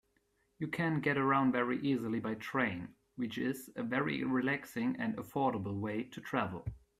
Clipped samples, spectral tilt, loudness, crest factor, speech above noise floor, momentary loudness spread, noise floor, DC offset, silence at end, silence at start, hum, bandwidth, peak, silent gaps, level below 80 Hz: under 0.1%; -6.5 dB/octave; -35 LUFS; 18 dB; 41 dB; 10 LU; -76 dBFS; under 0.1%; 0.25 s; 0.6 s; none; 14.5 kHz; -16 dBFS; none; -64 dBFS